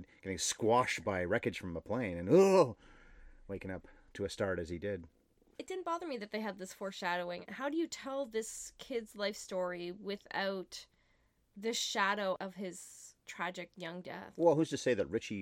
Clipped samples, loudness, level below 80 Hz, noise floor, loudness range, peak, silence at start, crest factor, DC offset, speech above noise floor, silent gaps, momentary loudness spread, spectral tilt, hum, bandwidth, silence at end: under 0.1%; -36 LUFS; -66 dBFS; -73 dBFS; 9 LU; -14 dBFS; 0 s; 22 dB; under 0.1%; 38 dB; none; 16 LU; -4.5 dB/octave; none; 16 kHz; 0 s